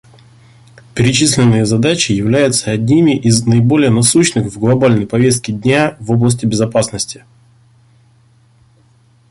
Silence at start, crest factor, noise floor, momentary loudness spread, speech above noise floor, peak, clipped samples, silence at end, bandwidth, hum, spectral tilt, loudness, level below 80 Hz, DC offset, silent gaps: 0.95 s; 14 dB; -50 dBFS; 6 LU; 38 dB; 0 dBFS; under 0.1%; 2.2 s; 11.5 kHz; none; -5 dB/octave; -12 LUFS; -44 dBFS; under 0.1%; none